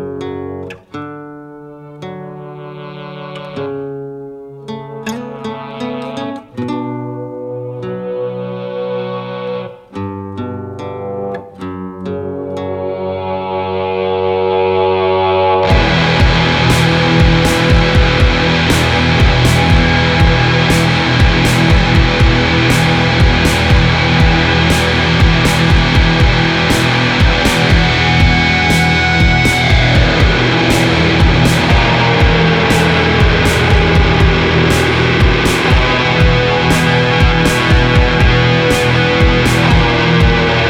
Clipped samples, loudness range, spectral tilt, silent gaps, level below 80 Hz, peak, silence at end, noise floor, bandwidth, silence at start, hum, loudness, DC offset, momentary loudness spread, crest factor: under 0.1%; 14 LU; -5.5 dB/octave; none; -20 dBFS; 0 dBFS; 0 s; -33 dBFS; 18.5 kHz; 0 s; none; -11 LUFS; under 0.1%; 15 LU; 12 dB